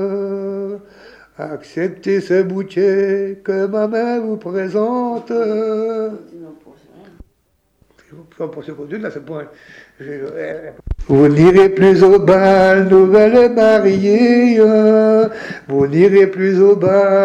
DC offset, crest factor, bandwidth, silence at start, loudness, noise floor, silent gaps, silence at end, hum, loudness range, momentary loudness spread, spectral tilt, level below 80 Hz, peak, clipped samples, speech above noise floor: under 0.1%; 12 dB; 8 kHz; 0 s; -12 LUFS; -62 dBFS; none; 0 s; none; 20 LU; 19 LU; -8 dB/octave; -40 dBFS; -2 dBFS; under 0.1%; 49 dB